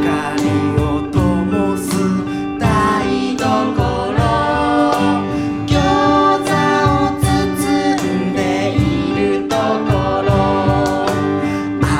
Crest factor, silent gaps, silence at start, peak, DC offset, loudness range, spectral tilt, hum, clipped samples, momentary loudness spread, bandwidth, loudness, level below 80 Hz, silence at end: 12 dB; none; 0 s; -2 dBFS; under 0.1%; 2 LU; -6 dB/octave; none; under 0.1%; 4 LU; 15.5 kHz; -16 LUFS; -30 dBFS; 0 s